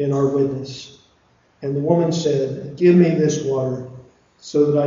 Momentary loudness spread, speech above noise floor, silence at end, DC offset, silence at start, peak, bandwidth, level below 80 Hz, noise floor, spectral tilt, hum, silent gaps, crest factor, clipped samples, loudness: 16 LU; 40 dB; 0 s; under 0.1%; 0 s; -2 dBFS; 7.6 kHz; -58 dBFS; -58 dBFS; -7 dB/octave; none; none; 16 dB; under 0.1%; -19 LUFS